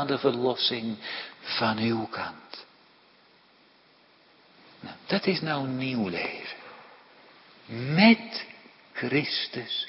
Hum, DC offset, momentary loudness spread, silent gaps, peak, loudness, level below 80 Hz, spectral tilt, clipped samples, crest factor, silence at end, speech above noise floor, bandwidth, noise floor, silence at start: none; under 0.1%; 22 LU; none; -6 dBFS; -27 LUFS; -72 dBFS; -9.5 dB/octave; under 0.1%; 22 dB; 0 s; 32 dB; 5.8 kHz; -60 dBFS; 0 s